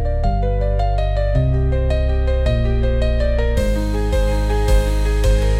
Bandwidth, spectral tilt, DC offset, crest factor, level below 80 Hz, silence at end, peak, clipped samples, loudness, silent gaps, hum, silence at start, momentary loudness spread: 13 kHz; -7 dB/octave; under 0.1%; 12 dB; -18 dBFS; 0 s; -4 dBFS; under 0.1%; -19 LUFS; none; none; 0 s; 2 LU